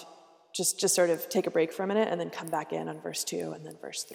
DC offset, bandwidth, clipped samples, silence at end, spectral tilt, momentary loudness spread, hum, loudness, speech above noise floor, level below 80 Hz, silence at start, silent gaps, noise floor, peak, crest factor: under 0.1%; 17 kHz; under 0.1%; 0 s; -3 dB/octave; 13 LU; none; -30 LUFS; 25 dB; -84 dBFS; 0 s; none; -55 dBFS; -14 dBFS; 16 dB